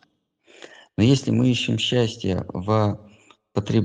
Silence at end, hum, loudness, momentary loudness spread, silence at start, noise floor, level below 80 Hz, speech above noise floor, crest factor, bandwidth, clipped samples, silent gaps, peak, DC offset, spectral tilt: 0 s; none; -22 LUFS; 11 LU; 1 s; -63 dBFS; -54 dBFS; 42 dB; 18 dB; 9.6 kHz; under 0.1%; none; -6 dBFS; under 0.1%; -6 dB/octave